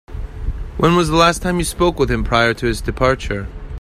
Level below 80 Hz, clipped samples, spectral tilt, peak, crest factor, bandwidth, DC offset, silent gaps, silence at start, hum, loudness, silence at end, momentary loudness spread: -28 dBFS; under 0.1%; -5 dB/octave; 0 dBFS; 18 dB; 15 kHz; under 0.1%; none; 0.1 s; none; -17 LUFS; 0 s; 15 LU